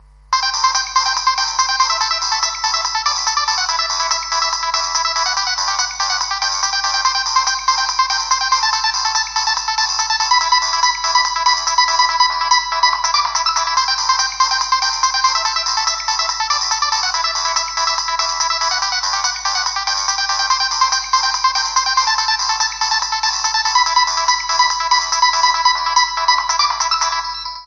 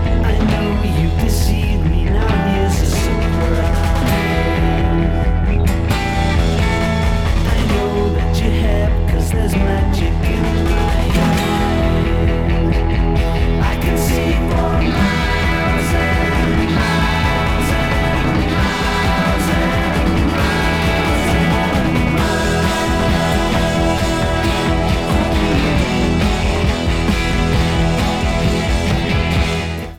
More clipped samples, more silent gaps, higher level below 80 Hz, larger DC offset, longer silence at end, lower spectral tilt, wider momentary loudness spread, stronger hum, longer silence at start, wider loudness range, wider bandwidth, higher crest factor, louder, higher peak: neither; neither; second, -46 dBFS vs -20 dBFS; neither; about the same, 0 s vs 0.05 s; second, 3.5 dB/octave vs -6 dB/octave; about the same, 4 LU vs 2 LU; neither; first, 0.3 s vs 0 s; about the same, 2 LU vs 1 LU; second, 8.4 kHz vs 17 kHz; about the same, 16 dB vs 14 dB; about the same, -15 LUFS vs -16 LUFS; about the same, 0 dBFS vs -2 dBFS